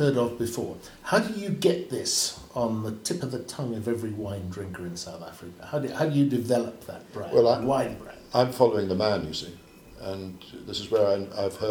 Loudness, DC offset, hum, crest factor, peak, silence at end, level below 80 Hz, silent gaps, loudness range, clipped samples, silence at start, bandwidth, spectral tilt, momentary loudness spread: -27 LUFS; under 0.1%; none; 22 dB; -6 dBFS; 0 s; -58 dBFS; none; 6 LU; under 0.1%; 0 s; 19 kHz; -5 dB/octave; 16 LU